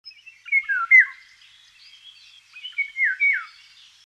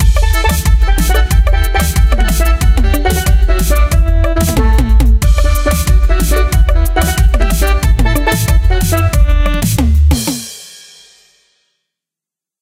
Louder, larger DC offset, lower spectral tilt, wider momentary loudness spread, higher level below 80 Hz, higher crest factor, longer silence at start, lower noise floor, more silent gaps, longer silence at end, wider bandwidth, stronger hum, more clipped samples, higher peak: second, -18 LUFS vs -12 LUFS; neither; second, 4 dB/octave vs -5 dB/octave; first, 14 LU vs 2 LU; second, -80 dBFS vs -10 dBFS; first, 20 dB vs 10 dB; about the same, 0.05 s vs 0 s; second, -52 dBFS vs -86 dBFS; neither; second, 0.6 s vs 1.9 s; second, 9 kHz vs 16.5 kHz; first, 50 Hz at -80 dBFS vs none; neither; second, -4 dBFS vs 0 dBFS